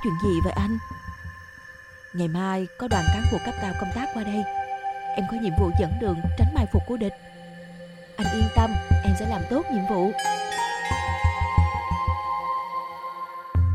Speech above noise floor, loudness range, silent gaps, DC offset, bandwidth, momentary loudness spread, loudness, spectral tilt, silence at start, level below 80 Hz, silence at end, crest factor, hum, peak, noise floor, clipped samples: 21 dB; 3 LU; none; under 0.1%; 12 kHz; 17 LU; -25 LUFS; -6.5 dB/octave; 0 s; -36 dBFS; 0 s; 20 dB; none; -6 dBFS; -45 dBFS; under 0.1%